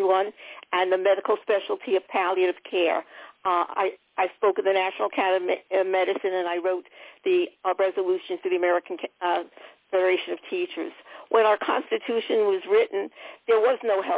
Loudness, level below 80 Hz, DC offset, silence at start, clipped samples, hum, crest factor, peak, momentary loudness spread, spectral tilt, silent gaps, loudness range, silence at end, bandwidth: -25 LUFS; -76 dBFS; under 0.1%; 0 s; under 0.1%; none; 16 dB; -8 dBFS; 10 LU; -7 dB/octave; none; 2 LU; 0 s; 4 kHz